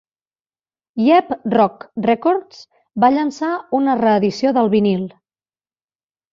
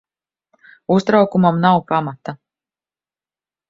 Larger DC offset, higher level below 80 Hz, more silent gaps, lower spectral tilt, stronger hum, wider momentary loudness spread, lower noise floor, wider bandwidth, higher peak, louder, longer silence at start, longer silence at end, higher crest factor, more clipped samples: neither; about the same, -62 dBFS vs -60 dBFS; neither; about the same, -7 dB/octave vs -8 dB/octave; neither; second, 9 LU vs 18 LU; about the same, under -90 dBFS vs under -90 dBFS; about the same, 7.6 kHz vs 7.6 kHz; about the same, -2 dBFS vs 0 dBFS; about the same, -17 LUFS vs -16 LUFS; about the same, 0.95 s vs 0.9 s; about the same, 1.25 s vs 1.35 s; about the same, 16 dB vs 18 dB; neither